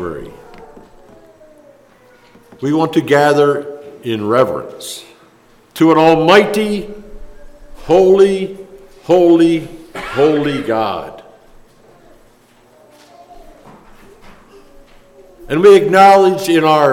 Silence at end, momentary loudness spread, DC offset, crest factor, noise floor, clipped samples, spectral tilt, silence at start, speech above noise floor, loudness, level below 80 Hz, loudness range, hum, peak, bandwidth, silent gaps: 0 s; 22 LU; under 0.1%; 14 dB; -48 dBFS; under 0.1%; -5.5 dB/octave; 0 s; 37 dB; -12 LUFS; -44 dBFS; 7 LU; none; 0 dBFS; 16.5 kHz; none